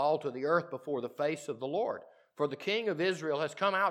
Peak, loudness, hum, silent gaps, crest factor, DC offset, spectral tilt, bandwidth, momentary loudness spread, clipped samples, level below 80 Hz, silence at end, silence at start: -16 dBFS; -33 LUFS; none; none; 18 dB; under 0.1%; -5 dB/octave; 14 kHz; 6 LU; under 0.1%; under -90 dBFS; 0 s; 0 s